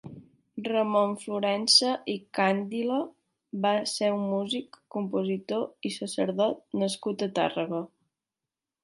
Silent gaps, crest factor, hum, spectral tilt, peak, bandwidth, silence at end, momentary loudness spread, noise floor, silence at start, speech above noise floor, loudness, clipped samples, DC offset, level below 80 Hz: none; 22 dB; none; -4 dB/octave; -6 dBFS; 11.5 kHz; 0.95 s; 11 LU; -90 dBFS; 0.05 s; 62 dB; -28 LUFS; under 0.1%; under 0.1%; -78 dBFS